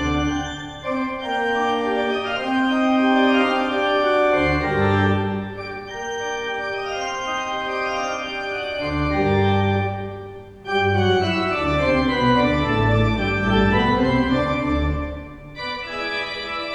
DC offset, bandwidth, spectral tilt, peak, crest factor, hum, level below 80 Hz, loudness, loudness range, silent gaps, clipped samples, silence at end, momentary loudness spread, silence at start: under 0.1%; 10 kHz; -6 dB/octave; -6 dBFS; 16 dB; none; -36 dBFS; -21 LUFS; 5 LU; none; under 0.1%; 0 s; 11 LU; 0 s